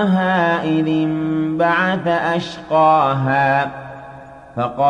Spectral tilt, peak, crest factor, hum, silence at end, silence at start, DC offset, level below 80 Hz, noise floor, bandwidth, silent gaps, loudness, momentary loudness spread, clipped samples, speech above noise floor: -7.5 dB/octave; -4 dBFS; 14 dB; none; 0 s; 0 s; under 0.1%; -54 dBFS; -38 dBFS; 9.6 kHz; none; -17 LUFS; 16 LU; under 0.1%; 21 dB